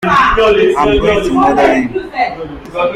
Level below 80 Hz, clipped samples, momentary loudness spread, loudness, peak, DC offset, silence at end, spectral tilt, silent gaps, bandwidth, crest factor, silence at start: -28 dBFS; under 0.1%; 9 LU; -11 LUFS; 0 dBFS; under 0.1%; 0 s; -5.5 dB/octave; none; 12.5 kHz; 10 dB; 0 s